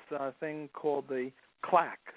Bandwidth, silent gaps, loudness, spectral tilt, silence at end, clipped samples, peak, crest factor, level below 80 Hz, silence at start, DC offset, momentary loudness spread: 4 kHz; none; -34 LUFS; -4 dB/octave; 0.05 s; under 0.1%; -12 dBFS; 22 dB; -84 dBFS; 0.1 s; under 0.1%; 12 LU